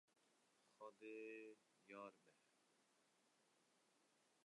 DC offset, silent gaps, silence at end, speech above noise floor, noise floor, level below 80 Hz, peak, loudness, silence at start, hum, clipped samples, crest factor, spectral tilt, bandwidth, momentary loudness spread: under 0.1%; none; 0.05 s; 23 dB; -82 dBFS; under -90 dBFS; -46 dBFS; -60 LUFS; 0.15 s; none; under 0.1%; 18 dB; -4 dB/octave; 11 kHz; 7 LU